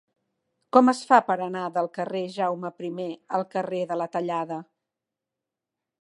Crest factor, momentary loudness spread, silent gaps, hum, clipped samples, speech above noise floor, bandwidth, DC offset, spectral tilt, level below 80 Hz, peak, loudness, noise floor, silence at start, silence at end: 24 dB; 13 LU; none; none; under 0.1%; 62 dB; 11 kHz; under 0.1%; -6 dB/octave; -82 dBFS; -2 dBFS; -25 LUFS; -87 dBFS; 0.75 s; 1.4 s